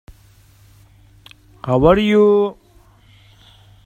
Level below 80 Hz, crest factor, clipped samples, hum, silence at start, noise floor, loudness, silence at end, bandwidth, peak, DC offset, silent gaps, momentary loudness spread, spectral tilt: -40 dBFS; 18 dB; under 0.1%; none; 1.65 s; -50 dBFS; -14 LUFS; 1.35 s; 8.8 kHz; 0 dBFS; under 0.1%; none; 11 LU; -8 dB/octave